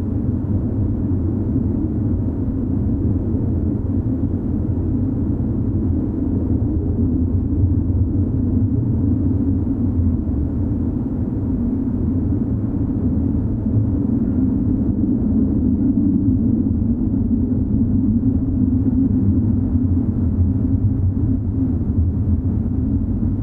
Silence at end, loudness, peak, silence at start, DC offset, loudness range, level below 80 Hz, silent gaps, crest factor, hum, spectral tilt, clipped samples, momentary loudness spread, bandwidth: 0 s; -19 LUFS; -4 dBFS; 0 s; under 0.1%; 3 LU; -26 dBFS; none; 14 dB; none; -14 dB/octave; under 0.1%; 4 LU; 2 kHz